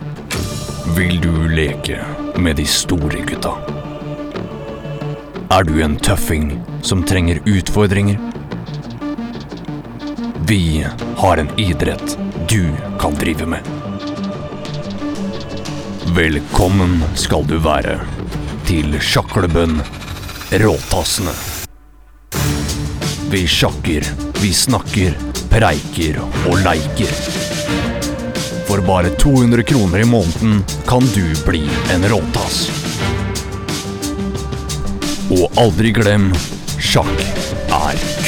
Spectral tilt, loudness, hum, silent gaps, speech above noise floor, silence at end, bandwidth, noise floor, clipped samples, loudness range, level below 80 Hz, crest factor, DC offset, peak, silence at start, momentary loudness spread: -5 dB/octave; -17 LUFS; none; none; 27 dB; 0 s; 19.5 kHz; -42 dBFS; under 0.1%; 5 LU; -26 dBFS; 16 dB; under 0.1%; 0 dBFS; 0 s; 12 LU